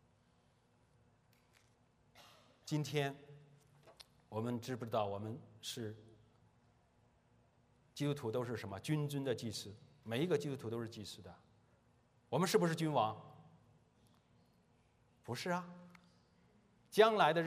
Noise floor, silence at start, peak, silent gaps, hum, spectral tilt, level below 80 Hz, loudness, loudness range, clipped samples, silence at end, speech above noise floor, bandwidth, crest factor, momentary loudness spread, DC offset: -73 dBFS; 2.15 s; -16 dBFS; none; none; -5.5 dB/octave; -80 dBFS; -39 LUFS; 7 LU; under 0.1%; 0 s; 35 dB; 15.5 kHz; 26 dB; 21 LU; under 0.1%